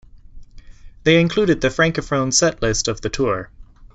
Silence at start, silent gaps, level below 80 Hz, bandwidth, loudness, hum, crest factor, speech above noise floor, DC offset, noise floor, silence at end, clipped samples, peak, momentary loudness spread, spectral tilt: 0.15 s; none; -38 dBFS; 8.2 kHz; -18 LUFS; none; 18 dB; 21 dB; under 0.1%; -39 dBFS; 0.1 s; under 0.1%; -2 dBFS; 7 LU; -4 dB/octave